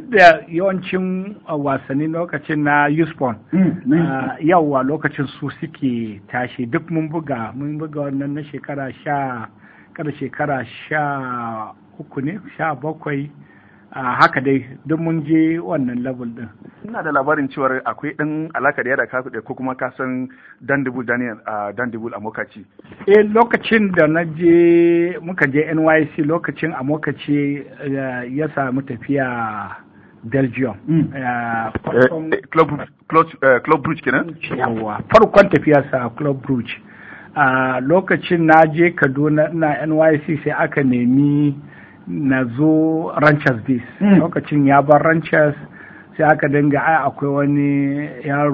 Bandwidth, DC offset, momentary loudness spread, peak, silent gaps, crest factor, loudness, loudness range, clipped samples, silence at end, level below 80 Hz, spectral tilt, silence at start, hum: 8 kHz; under 0.1%; 13 LU; 0 dBFS; none; 18 dB; -17 LUFS; 9 LU; under 0.1%; 0 s; -52 dBFS; -8.5 dB/octave; 0 s; none